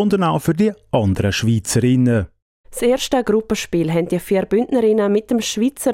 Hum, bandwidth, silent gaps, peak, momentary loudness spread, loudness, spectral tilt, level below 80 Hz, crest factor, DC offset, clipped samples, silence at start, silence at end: none; 16.5 kHz; 2.42-2.64 s; -4 dBFS; 5 LU; -18 LUFS; -5.5 dB/octave; -44 dBFS; 14 dB; under 0.1%; under 0.1%; 0 s; 0 s